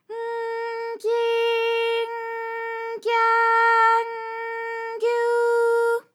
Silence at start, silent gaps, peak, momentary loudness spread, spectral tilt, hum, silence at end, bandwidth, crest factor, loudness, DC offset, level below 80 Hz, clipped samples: 0.1 s; none; -8 dBFS; 12 LU; 0 dB/octave; none; 0.15 s; 14 kHz; 14 dB; -22 LUFS; under 0.1%; under -90 dBFS; under 0.1%